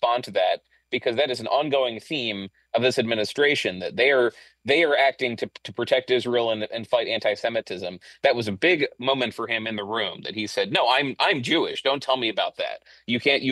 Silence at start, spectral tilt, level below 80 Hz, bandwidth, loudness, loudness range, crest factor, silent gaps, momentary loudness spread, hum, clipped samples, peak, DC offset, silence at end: 0 s; -4 dB/octave; -70 dBFS; 12.5 kHz; -23 LUFS; 3 LU; 18 dB; none; 10 LU; none; under 0.1%; -6 dBFS; under 0.1%; 0 s